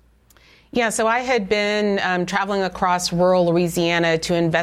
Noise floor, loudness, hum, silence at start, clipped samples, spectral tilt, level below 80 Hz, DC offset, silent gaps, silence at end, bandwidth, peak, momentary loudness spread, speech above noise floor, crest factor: -53 dBFS; -19 LUFS; none; 0.75 s; under 0.1%; -4.5 dB/octave; -50 dBFS; under 0.1%; none; 0 s; 16 kHz; -6 dBFS; 4 LU; 34 dB; 14 dB